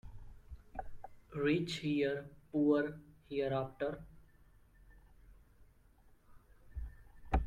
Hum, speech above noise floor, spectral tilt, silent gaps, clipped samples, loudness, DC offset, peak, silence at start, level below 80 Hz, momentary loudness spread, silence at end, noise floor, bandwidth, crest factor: none; 30 dB; -7 dB/octave; none; under 0.1%; -37 LUFS; under 0.1%; -18 dBFS; 0.05 s; -50 dBFS; 24 LU; 0 s; -65 dBFS; 11 kHz; 22 dB